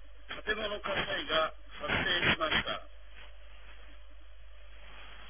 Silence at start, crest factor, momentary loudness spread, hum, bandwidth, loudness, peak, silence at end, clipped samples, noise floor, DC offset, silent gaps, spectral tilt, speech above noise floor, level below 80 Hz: 0 s; 20 dB; 26 LU; none; 3.7 kHz; -31 LUFS; -14 dBFS; 0 s; under 0.1%; -53 dBFS; 0.5%; none; -1 dB/octave; 21 dB; -52 dBFS